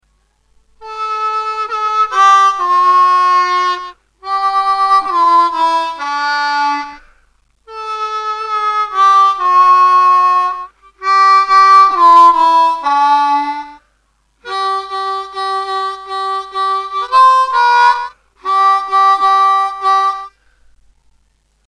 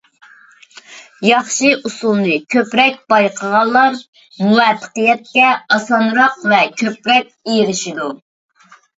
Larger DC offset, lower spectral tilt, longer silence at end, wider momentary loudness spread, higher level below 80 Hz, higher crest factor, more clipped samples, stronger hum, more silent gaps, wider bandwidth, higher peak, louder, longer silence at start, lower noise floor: neither; second, -0.5 dB/octave vs -3.5 dB/octave; first, 1.4 s vs 0.85 s; first, 13 LU vs 7 LU; first, -56 dBFS vs -66 dBFS; about the same, 12 dB vs 16 dB; neither; neither; second, none vs 4.08-4.13 s; first, 10.5 kHz vs 8 kHz; about the same, 0 dBFS vs 0 dBFS; first, -11 LUFS vs -14 LUFS; about the same, 0.8 s vs 0.9 s; first, -59 dBFS vs -45 dBFS